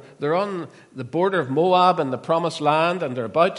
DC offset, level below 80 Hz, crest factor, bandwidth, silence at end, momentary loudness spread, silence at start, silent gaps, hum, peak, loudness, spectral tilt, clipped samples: under 0.1%; -72 dBFS; 16 dB; 11.5 kHz; 0 s; 12 LU; 0.05 s; none; none; -4 dBFS; -21 LUFS; -6 dB/octave; under 0.1%